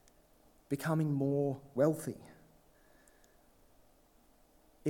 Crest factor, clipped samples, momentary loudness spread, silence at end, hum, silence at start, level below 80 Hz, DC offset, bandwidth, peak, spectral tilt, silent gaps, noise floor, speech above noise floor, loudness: 22 dB; under 0.1%; 10 LU; 0 s; none; 0.7 s; -70 dBFS; under 0.1%; 19 kHz; -16 dBFS; -7.5 dB/octave; none; -66 dBFS; 33 dB; -34 LUFS